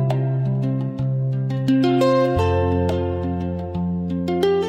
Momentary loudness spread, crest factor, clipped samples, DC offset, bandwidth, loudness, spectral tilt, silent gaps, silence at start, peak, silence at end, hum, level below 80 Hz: 8 LU; 14 dB; under 0.1%; under 0.1%; 8.8 kHz; -21 LUFS; -8.5 dB/octave; none; 0 s; -6 dBFS; 0 s; none; -40 dBFS